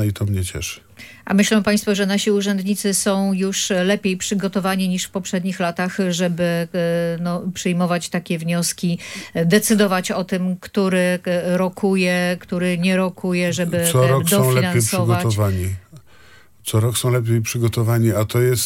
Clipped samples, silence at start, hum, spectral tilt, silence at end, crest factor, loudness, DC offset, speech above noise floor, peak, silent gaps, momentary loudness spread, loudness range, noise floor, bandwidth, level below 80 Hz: under 0.1%; 0 s; none; -5 dB/octave; 0 s; 16 dB; -19 LUFS; under 0.1%; 31 dB; -2 dBFS; none; 7 LU; 3 LU; -49 dBFS; 17 kHz; -54 dBFS